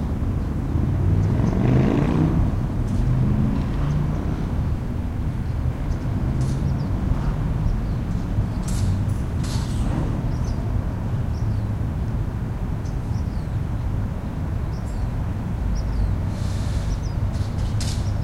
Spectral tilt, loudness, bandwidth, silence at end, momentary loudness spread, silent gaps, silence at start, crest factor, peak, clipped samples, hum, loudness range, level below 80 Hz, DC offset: -7.5 dB/octave; -24 LUFS; 13 kHz; 0 s; 7 LU; none; 0 s; 16 dB; -6 dBFS; under 0.1%; none; 5 LU; -28 dBFS; under 0.1%